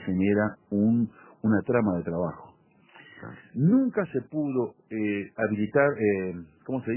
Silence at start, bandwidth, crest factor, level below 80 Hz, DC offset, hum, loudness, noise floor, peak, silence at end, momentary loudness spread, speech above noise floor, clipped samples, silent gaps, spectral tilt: 0 s; 3.2 kHz; 18 dB; -58 dBFS; under 0.1%; none; -27 LUFS; -56 dBFS; -8 dBFS; 0 s; 12 LU; 30 dB; under 0.1%; none; -12 dB/octave